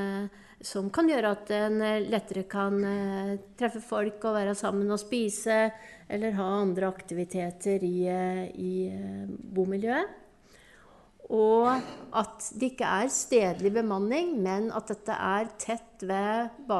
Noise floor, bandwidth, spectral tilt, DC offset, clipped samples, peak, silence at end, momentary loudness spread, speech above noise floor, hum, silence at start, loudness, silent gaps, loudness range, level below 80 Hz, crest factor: -57 dBFS; 12 kHz; -5 dB/octave; under 0.1%; under 0.1%; -12 dBFS; 0 s; 9 LU; 28 dB; none; 0 s; -29 LUFS; none; 4 LU; -64 dBFS; 18 dB